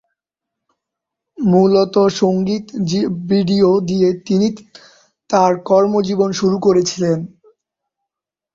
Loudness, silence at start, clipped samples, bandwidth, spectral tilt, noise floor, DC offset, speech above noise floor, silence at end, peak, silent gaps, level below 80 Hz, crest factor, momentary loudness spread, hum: -15 LUFS; 1.4 s; under 0.1%; 7.6 kHz; -6.5 dB/octave; -84 dBFS; under 0.1%; 69 dB; 1.25 s; -2 dBFS; none; -56 dBFS; 14 dB; 7 LU; none